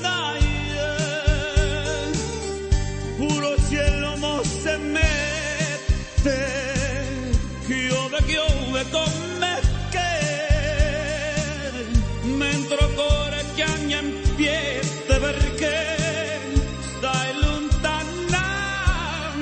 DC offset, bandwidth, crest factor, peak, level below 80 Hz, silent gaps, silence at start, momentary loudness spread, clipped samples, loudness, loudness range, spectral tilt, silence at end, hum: under 0.1%; 8.8 kHz; 18 dB; -4 dBFS; -26 dBFS; none; 0 s; 5 LU; under 0.1%; -23 LUFS; 1 LU; -4.5 dB/octave; 0 s; none